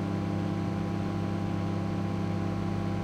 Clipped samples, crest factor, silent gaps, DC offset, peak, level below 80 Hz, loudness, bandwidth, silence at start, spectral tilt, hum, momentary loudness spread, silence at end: under 0.1%; 10 dB; none; under 0.1%; -20 dBFS; -50 dBFS; -31 LUFS; 9.8 kHz; 0 s; -8 dB/octave; none; 1 LU; 0 s